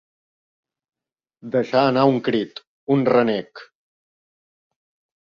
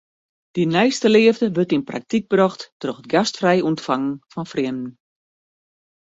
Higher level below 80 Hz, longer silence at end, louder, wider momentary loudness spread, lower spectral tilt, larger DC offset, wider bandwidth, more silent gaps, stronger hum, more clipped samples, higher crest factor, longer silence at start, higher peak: about the same, -66 dBFS vs -62 dBFS; first, 1.55 s vs 1.2 s; about the same, -20 LUFS vs -19 LUFS; about the same, 14 LU vs 15 LU; first, -8 dB/octave vs -5.5 dB/octave; neither; second, 7 kHz vs 8 kHz; first, 2.67-2.87 s vs 2.72-2.80 s; neither; neither; about the same, 20 dB vs 18 dB; first, 1.45 s vs 0.55 s; about the same, -2 dBFS vs -2 dBFS